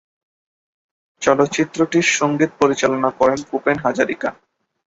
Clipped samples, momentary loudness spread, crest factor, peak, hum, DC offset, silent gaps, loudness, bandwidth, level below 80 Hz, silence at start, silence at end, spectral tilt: under 0.1%; 5 LU; 18 dB; 0 dBFS; none; under 0.1%; none; -18 LUFS; 8 kHz; -56 dBFS; 1.2 s; 0.55 s; -4 dB/octave